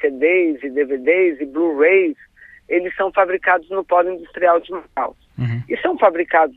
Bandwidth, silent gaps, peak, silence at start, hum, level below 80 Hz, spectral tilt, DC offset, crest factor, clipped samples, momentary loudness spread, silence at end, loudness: 4.1 kHz; none; -2 dBFS; 0 s; none; -56 dBFS; -9.5 dB/octave; under 0.1%; 16 dB; under 0.1%; 10 LU; 0.05 s; -18 LUFS